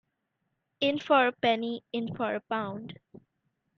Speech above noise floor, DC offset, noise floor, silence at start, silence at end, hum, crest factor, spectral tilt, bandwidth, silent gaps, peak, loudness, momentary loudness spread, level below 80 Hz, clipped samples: 51 dB; under 0.1%; -80 dBFS; 0.8 s; 0.85 s; none; 20 dB; -6 dB/octave; 7 kHz; none; -10 dBFS; -29 LUFS; 13 LU; -72 dBFS; under 0.1%